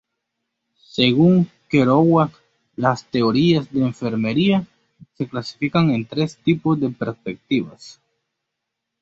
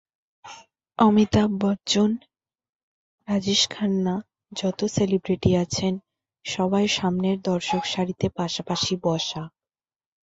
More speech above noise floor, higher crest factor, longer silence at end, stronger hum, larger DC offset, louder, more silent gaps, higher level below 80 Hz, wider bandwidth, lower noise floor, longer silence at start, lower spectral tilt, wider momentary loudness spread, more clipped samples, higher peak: second, 62 dB vs over 67 dB; about the same, 18 dB vs 20 dB; first, 1.1 s vs 0.8 s; neither; neither; first, -19 LUFS vs -23 LUFS; second, none vs 2.69-3.18 s; second, -56 dBFS vs -50 dBFS; about the same, 7.8 kHz vs 8 kHz; second, -80 dBFS vs under -90 dBFS; first, 0.95 s vs 0.45 s; first, -7.5 dB/octave vs -5 dB/octave; about the same, 12 LU vs 14 LU; neither; about the same, -2 dBFS vs -4 dBFS